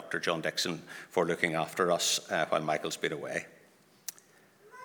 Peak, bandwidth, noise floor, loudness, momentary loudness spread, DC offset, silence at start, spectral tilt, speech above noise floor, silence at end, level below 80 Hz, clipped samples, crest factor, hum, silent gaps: -10 dBFS; over 20 kHz; -62 dBFS; -31 LUFS; 16 LU; under 0.1%; 0 s; -2.5 dB/octave; 30 dB; 0 s; -74 dBFS; under 0.1%; 22 dB; none; none